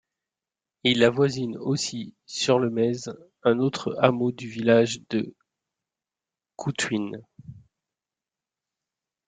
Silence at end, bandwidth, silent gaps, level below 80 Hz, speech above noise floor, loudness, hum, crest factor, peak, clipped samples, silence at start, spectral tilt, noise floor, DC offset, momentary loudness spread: 1.7 s; 9.4 kHz; none; -66 dBFS; over 66 dB; -24 LUFS; none; 24 dB; -4 dBFS; under 0.1%; 0.85 s; -5 dB/octave; under -90 dBFS; under 0.1%; 14 LU